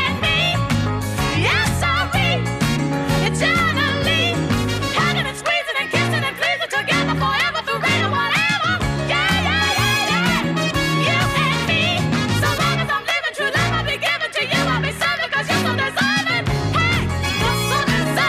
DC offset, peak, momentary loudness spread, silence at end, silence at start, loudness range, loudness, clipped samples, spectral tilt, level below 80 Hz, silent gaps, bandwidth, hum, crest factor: under 0.1%; -6 dBFS; 3 LU; 0 s; 0 s; 1 LU; -18 LUFS; under 0.1%; -4 dB/octave; -36 dBFS; none; 15.5 kHz; none; 12 dB